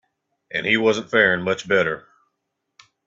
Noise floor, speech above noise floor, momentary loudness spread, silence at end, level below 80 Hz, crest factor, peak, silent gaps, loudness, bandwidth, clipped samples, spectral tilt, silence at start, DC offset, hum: -78 dBFS; 58 dB; 9 LU; 1.05 s; -62 dBFS; 20 dB; -2 dBFS; none; -20 LUFS; 7.8 kHz; under 0.1%; -4.5 dB/octave; 0.55 s; under 0.1%; none